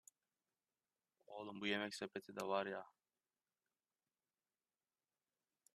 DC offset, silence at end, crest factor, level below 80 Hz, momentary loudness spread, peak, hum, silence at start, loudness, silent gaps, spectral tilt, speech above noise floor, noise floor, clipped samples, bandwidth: under 0.1%; 2.85 s; 26 dB; under -90 dBFS; 13 LU; -26 dBFS; none; 1.3 s; -45 LUFS; none; -4 dB/octave; over 45 dB; under -90 dBFS; under 0.1%; 13 kHz